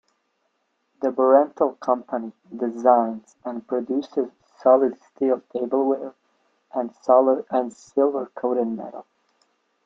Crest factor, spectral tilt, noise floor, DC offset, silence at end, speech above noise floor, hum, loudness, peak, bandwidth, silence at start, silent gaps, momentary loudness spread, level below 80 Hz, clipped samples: 20 dB; -7 dB/octave; -72 dBFS; under 0.1%; 0.85 s; 50 dB; none; -22 LUFS; -2 dBFS; 7.6 kHz; 1 s; none; 15 LU; -74 dBFS; under 0.1%